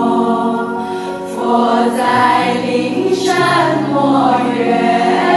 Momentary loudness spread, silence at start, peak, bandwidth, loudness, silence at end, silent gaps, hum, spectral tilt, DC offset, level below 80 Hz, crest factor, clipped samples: 8 LU; 0 s; 0 dBFS; 12.5 kHz; -14 LUFS; 0 s; none; none; -5.5 dB/octave; under 0.1%; -54 dBFS; 12 dB; under 0.1%